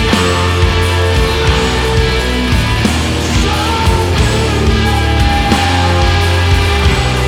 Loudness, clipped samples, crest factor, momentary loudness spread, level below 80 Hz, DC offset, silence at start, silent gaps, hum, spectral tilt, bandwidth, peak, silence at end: -12 LUFS; under 0.1%; 12 dB; 2 LU; -16 dBFS; under 0.1%; 0 s; none; none; -5 dB/octave; 16 kHz; 0 dBFS; 0 s